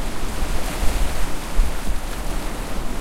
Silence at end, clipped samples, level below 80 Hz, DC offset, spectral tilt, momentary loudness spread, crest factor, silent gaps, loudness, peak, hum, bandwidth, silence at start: 0 s; under 0.1%; -22 dBFS; under 0.1%; -4 dB/octave; 4 LU; 14 dB; none; -27 LUFS; -4 dBFS; none; 16 kHz; 0 s